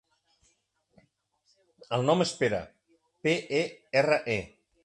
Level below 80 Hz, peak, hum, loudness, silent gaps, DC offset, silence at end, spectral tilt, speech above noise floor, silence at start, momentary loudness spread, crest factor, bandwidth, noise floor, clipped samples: -64 dBFS; -10 dBFS; none; -28 LUFS; none; under 0.1%; 0.4 s; -5 dB/octave; 45 dB; 1.9 s; 9 LU; 22 dB; 11.5 kHz; -73 dBFS; under 0.1%